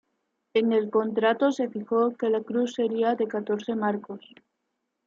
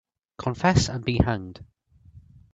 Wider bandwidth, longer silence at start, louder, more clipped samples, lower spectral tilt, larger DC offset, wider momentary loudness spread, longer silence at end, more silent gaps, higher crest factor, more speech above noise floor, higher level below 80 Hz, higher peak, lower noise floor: second, 7.6 kHz vs 8.4 kHz; first, 0.55 s vs 0.4 s; about the same, -26 LUFS vs -24 LUFS; neither; about the same, -6 dB/octave vs -5.5 dB/octave; neither; second, 6 LU vs 11 LU; first, 0.9 s vs 0.35 s; neither; second, 18 dB vs 24 dB; first, 54 dB vs 28 dB; second, -76 dBFS vs -40 dBFS; second, -10 dBFS vs -2 dBFS; first, -80 dBFS vs -52 dBFS